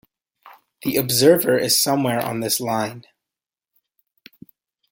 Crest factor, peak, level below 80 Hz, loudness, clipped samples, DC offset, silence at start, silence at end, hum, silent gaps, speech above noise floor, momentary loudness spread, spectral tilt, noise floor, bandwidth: 20 dB; -2 dBFS; -62 dBFS; -19 LUFS; under 0.1%; under 0.1%; 0.45 s; 1.9 s; none; none; 69 dB; 10 LU; -3.5 dB/octave; -88 dBFS; 17 kHz